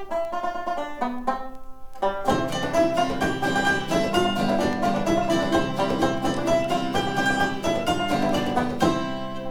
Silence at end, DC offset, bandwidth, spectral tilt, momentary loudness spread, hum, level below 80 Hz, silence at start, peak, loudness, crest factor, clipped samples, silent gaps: 0 s; 2%; 18.5 kHz; -5 dB/octave; 7 LU; none; -42 dBFS; 0 s; -6 dBFS; -24 LUFS; 18 dB; under 0.1%; none